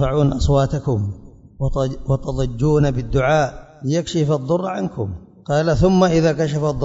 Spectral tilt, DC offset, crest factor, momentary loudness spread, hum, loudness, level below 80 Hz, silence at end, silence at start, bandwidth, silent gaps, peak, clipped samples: -7 dB/octave; under 0.1%; 18 dB; 10 LU; none; -19 LUFS; -32 dBFS; 0 s; 0 s; 7.8 kHz; none; -2 dBFS; under 0.1%